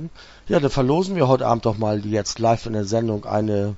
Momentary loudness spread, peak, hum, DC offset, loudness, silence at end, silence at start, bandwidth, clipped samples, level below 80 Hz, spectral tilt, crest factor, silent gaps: 5 LU; -2 dBFS; none; under 0.1%; -21 LUFS; 0 s; 0 s; 8 kHz; under 0.1%; -44 dBFS; -6.5 dB/octave; 18 dB; none